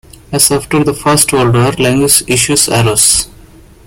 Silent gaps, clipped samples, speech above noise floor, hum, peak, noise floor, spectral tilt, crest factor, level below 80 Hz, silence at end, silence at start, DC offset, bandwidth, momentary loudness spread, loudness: none; 0.2%; 28 dB; none; 0 dBFS; -38 dBFS; -3.5 dB/octave; 12 dB; -36 dBFS; 0.55 s; 0.3 s; under 0.1%; over 20 kHz; 5 LU; -9 LUFS